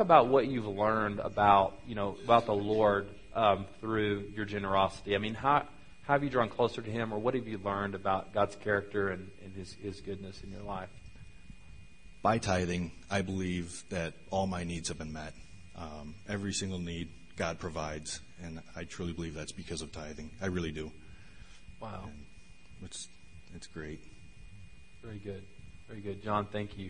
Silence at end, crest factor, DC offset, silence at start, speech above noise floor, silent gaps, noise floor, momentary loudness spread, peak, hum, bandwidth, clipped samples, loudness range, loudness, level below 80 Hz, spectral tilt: 0 s; 26 dB; 0.3%; 0 s; 23 dB; none; -55 dBFS; 18 LU; -6 dBFS; none; 10.5 kHz; under 0.1%; 18 LU; -33 LUFS; -56 dBFS; -5.5 dB/octave